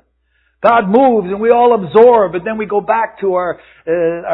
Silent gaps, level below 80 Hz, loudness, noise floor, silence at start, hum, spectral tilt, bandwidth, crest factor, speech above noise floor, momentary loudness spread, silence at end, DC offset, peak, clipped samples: none; -50 dBFS; -12 LUFS; -60 dBFS; 0.65 s; none; -9.5 dB/octave; 4.1 kHz; 12 dB; 48 dB; 10 LU; 0 s; under 0.1%; 0 dBFS; under 0.1%